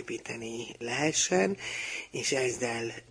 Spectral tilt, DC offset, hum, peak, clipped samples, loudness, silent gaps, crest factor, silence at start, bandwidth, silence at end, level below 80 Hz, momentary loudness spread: -3 dB/octave; under 0.1%; none; -12 dBFS; under 0.1%; -30 LUFS; none; 20 dB; 0 s; 10.5 kHz; 0.1 s; -66 dBFS; 12 LU